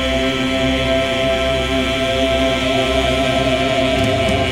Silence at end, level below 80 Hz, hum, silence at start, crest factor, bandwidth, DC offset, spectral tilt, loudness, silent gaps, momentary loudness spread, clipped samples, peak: 0 s; -28 dBFS; none; 0 s; 12 dB; 16.5 kHz; under 0.1%; -4.5 dB/octave; -16 LUFS; none; 1 LU; under 0.1%; -4 dBFS